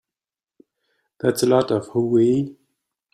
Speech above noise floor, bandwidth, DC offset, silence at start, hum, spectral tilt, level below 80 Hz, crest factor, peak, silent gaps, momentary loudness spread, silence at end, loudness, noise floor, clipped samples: over 71 dB; 15 kHz; under 0.1%; 1.25 s; none; -6 dB/octave; -62 dBFS; 18 dB; -4 dBFS; none; 6 LU; 0.6 s; -20 LUFS; under -90 dBFS; under 0.1%